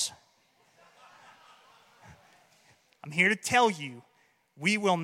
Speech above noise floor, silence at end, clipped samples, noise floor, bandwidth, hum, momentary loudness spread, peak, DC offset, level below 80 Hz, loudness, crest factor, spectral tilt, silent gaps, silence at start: 41 dB; 0 s; under 0.1%; -68 dBFS; 16.5 kHz; none; 16 LU; -10 dBFS; under 0.1%; -74 dBFS; -27 LUFS; 22 dB; -3.5 dB/octave; none; 0 s